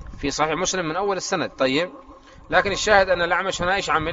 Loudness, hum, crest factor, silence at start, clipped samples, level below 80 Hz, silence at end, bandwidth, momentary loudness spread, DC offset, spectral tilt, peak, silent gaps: -21 LUFS; none; 22 dB; 0 s; under 0.1%; -44 dBFS; 0 s; 8 kHz; 7 LU; under 0.1%; -2 dB/octave; 0 dBFS; none